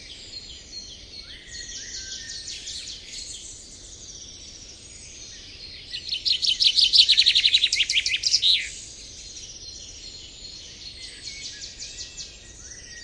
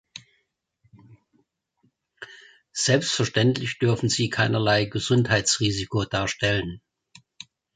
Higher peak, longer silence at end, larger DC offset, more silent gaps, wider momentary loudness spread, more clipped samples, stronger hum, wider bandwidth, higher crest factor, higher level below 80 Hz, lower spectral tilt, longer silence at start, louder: first, -2 dBFS vs -6 dBFS; second, 0 s vs 0.95 s; neither; neither; about the same, 23 LU vs 23 LU; neither; neither; first, 11 kHz vs 9.6 kHz; about the same, 24 dB vs 20 dB; about the same, -52 dBFS vs -52 dBFS; second, 1.5 dB/octave vs -4 dB/octave; second, 0 s vs 0.15 s; first, -19 LUFS vs -23 LUFS